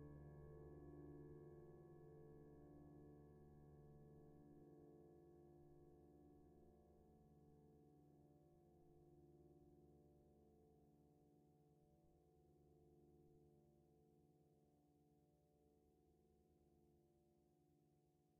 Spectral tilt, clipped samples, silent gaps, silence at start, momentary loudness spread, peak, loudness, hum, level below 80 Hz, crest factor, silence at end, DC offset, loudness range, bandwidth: -8.5 dB/octave; under 0.1%; none; 0 s; 7 LU; -50 dBFS; -65 LUFS; none; -78 dBFS; 18 dB; 0 s; under 0.1%; 6 LU; 2.2 kHz